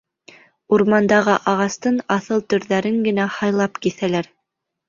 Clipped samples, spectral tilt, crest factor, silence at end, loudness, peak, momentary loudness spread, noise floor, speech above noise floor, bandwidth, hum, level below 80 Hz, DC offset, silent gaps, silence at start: under 0.1%; -5.5 dB/octave; 18 dB; 0.65 s; -19 LUFS; -2 dBFS; 7 LU; -78 dBFS; 60 dB; 7.6 kHz; none; -60 dBFS; under 0.1%; none; 0.7 s